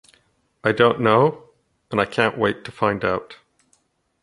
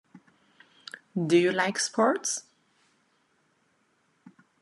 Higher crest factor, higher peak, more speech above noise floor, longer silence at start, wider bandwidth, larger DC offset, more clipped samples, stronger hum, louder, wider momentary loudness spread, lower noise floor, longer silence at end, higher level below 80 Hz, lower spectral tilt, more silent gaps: about the same, 20 dB vs 22 dB; first, -2 dBFS vs -10 dBFS; about the same, 46 dB vs 45 dB; second, 0.65 s vs 1.15 s; about the same, 11 kHz vs 12 kHz; neither; neither; neither; first, -20 LUFS vs -26 LUFS; second, 9 LU vs 22 LU; second, -65 dBFS vs -70 dBFS; second, 0.9 s vs 2.2 s; first, -56 dBFS vs -82 dBFS; first, -6.5 dB/octave vs -4 dB/octave; neither